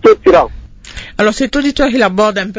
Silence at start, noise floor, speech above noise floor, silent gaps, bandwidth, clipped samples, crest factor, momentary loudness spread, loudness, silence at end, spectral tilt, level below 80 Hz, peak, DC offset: 0.05 s; -30 dBFS; 19 dB; none; 8 kHz; under 0.1%; 12 dB; 16 LU; -12 LUFS; 0 s; -5 dB/octave; -32 dBFS; 0 dBFS; under 0.1%